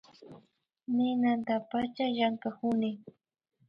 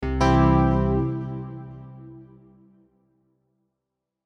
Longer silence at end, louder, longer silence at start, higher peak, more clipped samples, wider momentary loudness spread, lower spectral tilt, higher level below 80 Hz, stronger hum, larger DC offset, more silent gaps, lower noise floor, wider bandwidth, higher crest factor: second, 0.6 s vs 2 s; second, -31 LUFS vs -22 LUFS; first, 0.2 s vs 0 s; second, -16 dBFS vs -8 dBFS; neither; second, 7 LU vs 24 LU; about the same, -7.5 dB/octave vs -8 dB/octave; second, -72 dBFS vs -34 dBFS; neither; neither; neither; second, -66 dBFS vs -83 dBFS; second, 5.6 kHz vs 7 kHz; about the same, 16 dB vs 18 dB